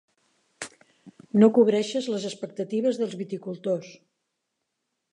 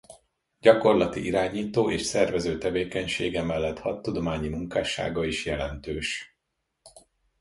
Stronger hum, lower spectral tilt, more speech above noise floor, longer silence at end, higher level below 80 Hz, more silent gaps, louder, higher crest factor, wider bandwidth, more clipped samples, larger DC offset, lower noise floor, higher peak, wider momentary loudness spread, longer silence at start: neither; about the same, -6 dB/octave vs -5 dB/octave; about the same, 57 dB vs 54 dB; first, 1.2 s vs 0.4 s; second, -80 dBFS vs -46 dBFS; neither; about the same, -25 LUFS vs -26 LUFS; about the same, 22 dB vs 24 dB; about the same, 11 kHz vs 11.5 kHz; neither; neither; about the same, -80 dBFS vs -80 dBFS; about the same, -6 dBFS vs -4 dBFS; first, 21 LU vs 10 LU; first, 0.6 s vs 0.1 s